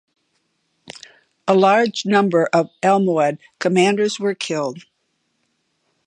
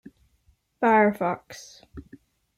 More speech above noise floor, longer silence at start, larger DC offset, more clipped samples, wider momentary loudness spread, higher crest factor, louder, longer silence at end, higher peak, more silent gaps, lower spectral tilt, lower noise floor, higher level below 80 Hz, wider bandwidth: first, 52 dB vs 41 dB; about the same, 0.9 s vs 0.8 s; neither; neither; second, 23 LU vs 26 LU; about the same, 18 dB vs 18 dB; first, -18 LUFS vs -23 LUFS; first, 1.25 s vs 0.55 s; first, -2 dBFS vs -8 dBFS; neither; about the same, -5 dB/octave vs -6 dB/octave; first, -70 dBFS vs -65 dBFS; second, -72 dBFS vs -58 dBFS; second, 10.5 kHz vs 15.5 kHz